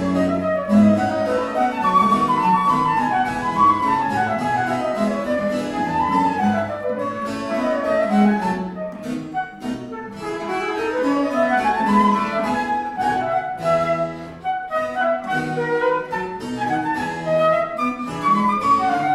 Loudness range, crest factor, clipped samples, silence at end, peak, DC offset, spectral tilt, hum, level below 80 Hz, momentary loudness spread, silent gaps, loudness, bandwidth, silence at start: 5 LU; 16 dB; under 0.1%; 0 s; -4 dBFS; under 0.1%; -6.5 dB/octave; none; -50 dBFS; 10 LU; none; -20 LUFS; 13 kHz; 0 s